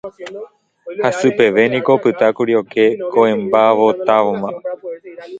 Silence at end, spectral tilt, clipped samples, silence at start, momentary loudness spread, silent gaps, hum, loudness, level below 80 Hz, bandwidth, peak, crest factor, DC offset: 0 s; -6 dB/octave; under 0.1%; 0.05 s; 18 LU; none; none; -14 LUFS; -60 dBFS; 7.8 kHz; 0 dBFS; 16 dB; under 0.1%